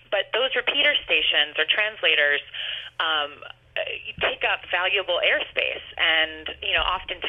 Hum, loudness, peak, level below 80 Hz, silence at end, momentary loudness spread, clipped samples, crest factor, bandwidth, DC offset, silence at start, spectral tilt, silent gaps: none; -22 LUFS; -6 dBFS; -52 dBFS; 0 s; 11 LU; under 0.1%; 20 dB; 6 kHz; under 0.1%; 0.1 s; -4 dB/octave; none